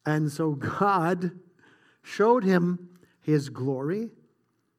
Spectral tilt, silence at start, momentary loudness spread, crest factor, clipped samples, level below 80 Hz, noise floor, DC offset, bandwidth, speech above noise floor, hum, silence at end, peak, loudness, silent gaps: -7.5 dB/octave; 0.05 s; 13 LU; 18 dB; under 0.1%; -72 dBFS; -71 dBFS; under 0.1%; 15 kHz; 46 dB; none; 0.7 s; -8 dBFS; -26 LUFS; none